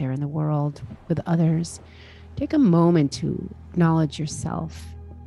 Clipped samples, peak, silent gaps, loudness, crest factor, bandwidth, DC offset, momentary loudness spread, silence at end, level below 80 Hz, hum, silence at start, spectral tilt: under 0.1%; -6 dBFS; none; -23 LUFS; 16 dB; 11.5 kHz; under 0.1%; 19 LU; 0 s; -46 dBFS; none; 0 s; -7.5 dB/octave